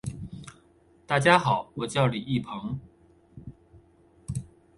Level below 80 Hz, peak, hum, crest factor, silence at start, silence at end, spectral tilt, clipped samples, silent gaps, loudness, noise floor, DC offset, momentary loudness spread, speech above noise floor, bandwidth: -54 dBFS; -4 dBFS; none; 26 dB; 0.05 s; 0.35 s; -5.5 dB/octave; under 0.1%; none; -26 LUFS; -60 dBFS; under 0.1%; 27 LU; 35 dB; 11.5 kHz